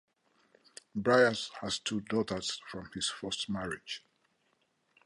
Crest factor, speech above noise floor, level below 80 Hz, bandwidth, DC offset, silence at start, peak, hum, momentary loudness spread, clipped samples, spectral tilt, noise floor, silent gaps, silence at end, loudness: 22 dB; 43 dB; -66 dBFS; 11.5 kHz; under 0.1%; 0.95 s; -12 dBFS; none; 17 LU; under 0.1%; -3.5 dB/octave; -75 dBFS; none; 1.1 s; -33 LUFS